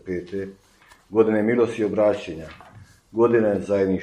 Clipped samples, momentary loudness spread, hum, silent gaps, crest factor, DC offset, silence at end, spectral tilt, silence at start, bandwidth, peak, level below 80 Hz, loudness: under 0.1%; 16 LU; none; none; 18 dB; under 0.1%; 0 s; -7.5 dB/octave; 0.05 s; 9.8 kHz; -6 dBFS; -56 dBFS; -22 LUFS